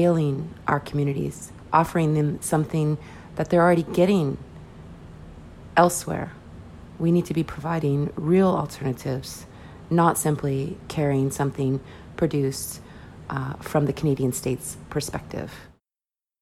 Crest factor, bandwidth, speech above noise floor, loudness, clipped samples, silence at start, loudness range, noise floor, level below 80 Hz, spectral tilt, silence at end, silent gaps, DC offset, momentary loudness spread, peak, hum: 20 dB; 15.5 kHz; over 67 dB; -24 LUFS; under 0.1%; 0 s; 4 LU; under -90 dBFS; -50 dBFS; -6.5 dB/octave; 0.75 s; none; under 0.1%; 23 LU; -4 dBFS; none